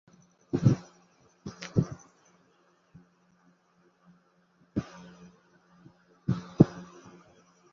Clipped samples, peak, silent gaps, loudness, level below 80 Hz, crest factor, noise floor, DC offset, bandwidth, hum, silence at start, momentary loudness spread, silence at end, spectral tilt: under 0.1%; -4 dBFS; none; -29 LUFS; -58 dBFS; 30 dB; -67 dBFS; under 0.1%; 7.2 kHz; none; 0.55 s; 25 LU; 0.9 s; -9 dB/octave